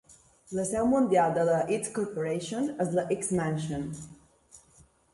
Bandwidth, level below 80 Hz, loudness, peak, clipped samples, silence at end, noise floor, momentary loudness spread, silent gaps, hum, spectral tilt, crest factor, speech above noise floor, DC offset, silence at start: 11.5 kHz; -60 dBFS; -29 LUFS; -12 dBFS; under 0.1%; 0.55 s; -61 dBFS; 12 LU; none; none; -5.5 dB/octave; 16 dB; 33 dB; under 0.1%; 0.5 s